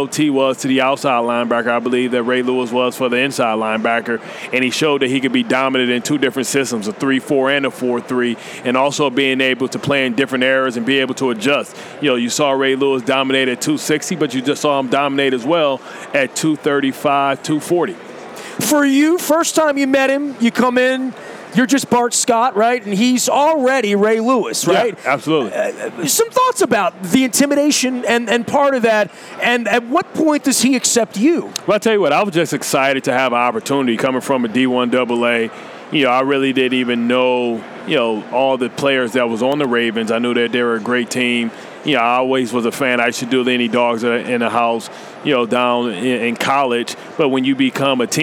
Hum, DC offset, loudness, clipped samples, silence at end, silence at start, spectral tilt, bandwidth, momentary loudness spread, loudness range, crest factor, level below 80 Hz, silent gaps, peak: none; under 0.1%; -16 LUFS; under 0.1%; 0 s; 0 s; -3.5 dB/octave; 17 kHz; 5 LU; 2 LU; 16 dB; -66 dBFS; none; 0 dBFS